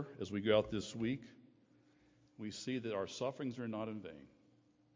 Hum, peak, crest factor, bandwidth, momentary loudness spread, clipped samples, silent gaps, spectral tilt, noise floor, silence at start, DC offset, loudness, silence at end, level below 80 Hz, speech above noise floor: none; -18 dBFS; 24 dB; 7.6 kHz; 16 LU; under 0.1%; none; -5.5 dB/octave; -71 dBFS; 0 s; under 0.1%; -40 LUFS; 0.7 s; -68 dBFS; 31 dB